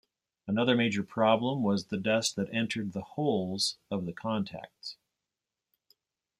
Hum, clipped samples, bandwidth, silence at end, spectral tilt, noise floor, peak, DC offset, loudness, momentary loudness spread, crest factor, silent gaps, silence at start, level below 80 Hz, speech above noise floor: none; under 0.1%; 15 kHz; 1.45 s; -4.5 dB/octave; -89 dBFS; -12 dBFS; under 0.1%; -30 LUFS; 14 LU; 20 dB; none; 0.45 s; -70 dBFS; 59 dB